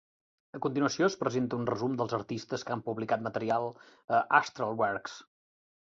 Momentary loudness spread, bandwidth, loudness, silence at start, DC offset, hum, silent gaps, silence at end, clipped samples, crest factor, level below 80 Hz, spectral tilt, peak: 10 LU; 7.8 kHz; -31 LUFS; 0.55 s; under 0.1%; none; 4.04-4.08 s; 0.65 s; under 0.1%; 24 dB; -70 dBFS; -5.5 dB/octave; -8 dBFS